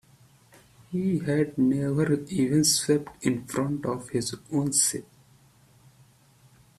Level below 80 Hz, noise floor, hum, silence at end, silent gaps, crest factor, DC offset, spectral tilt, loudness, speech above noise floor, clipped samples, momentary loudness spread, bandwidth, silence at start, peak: -60 dBFS; -58 dBFS; none; 1.75 s; none; 18 dB; under 0.1%; -4.5 dB/octave; -26 LUFS; 33 dB; under 0.1%; 9 LU; 15 kHz; 0.9 s; -8 dBFS